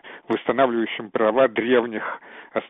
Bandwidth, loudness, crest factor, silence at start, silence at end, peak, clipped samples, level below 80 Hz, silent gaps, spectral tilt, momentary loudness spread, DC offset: 3.9 kHz; -22 LUFS; 16 dB; 0.05 s; 0 s; -6 dBFS; under 0.1%; -66 dBFS; none; -3 dB/octave; 12 LU; under 0.1%